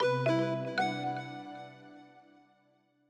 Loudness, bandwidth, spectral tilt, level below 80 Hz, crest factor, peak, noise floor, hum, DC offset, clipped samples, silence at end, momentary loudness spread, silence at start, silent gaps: -33 LUFS; 10 kHz; -6.5 dB/octave; -84 dBFS; 16 dB; -18 dBFS; -70 dBFS; none; under 0.1%; under 0.1%; 0.9 s; 24 LU; 0 s; none